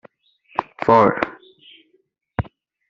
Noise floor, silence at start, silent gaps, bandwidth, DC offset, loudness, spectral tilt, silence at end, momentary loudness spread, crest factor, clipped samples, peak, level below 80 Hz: -65 dBFS; 0.6 s; none; 7.4 kHz; under 0.1%; -20 LUFS; -5.5 dB/octave; 0.45 s; 16 LU; 20 dB; under 0.1%; -2 dBFS; -48 dBFS